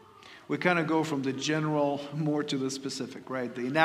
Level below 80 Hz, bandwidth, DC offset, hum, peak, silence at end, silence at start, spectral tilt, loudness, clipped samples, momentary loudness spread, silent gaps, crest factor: -76 dBFS; 14.5 kHz; under 0.1%; none; -8 dBFS; 0 s; 0.2 s; -5 dB/octave; -30 LUFS; under 0.1%; 9 LU; none; 22 dB